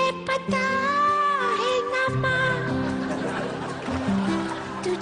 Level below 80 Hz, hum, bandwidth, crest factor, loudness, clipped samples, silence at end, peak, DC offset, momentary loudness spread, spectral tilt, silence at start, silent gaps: -52 dBFS; none; 10 kHz; 12 dB; -24 LUFS; under 0.1%; 0 s; -12 dBFS; under 0.1%; 8 LU; -5.5 dB/octave; 0 s; none